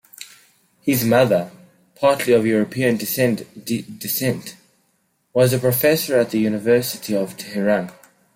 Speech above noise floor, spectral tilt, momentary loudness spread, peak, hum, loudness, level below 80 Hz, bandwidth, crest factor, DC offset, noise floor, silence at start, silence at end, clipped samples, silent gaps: 48 dB; -5 dB/octave; 11 LU; -2 dBFS; none; -19 LUFS; -60 dBFS; 16.5 kHz; 18 dB; under 0.1%; -66 dBFS; 0.2 s; 0.45 s; under 0.1%; none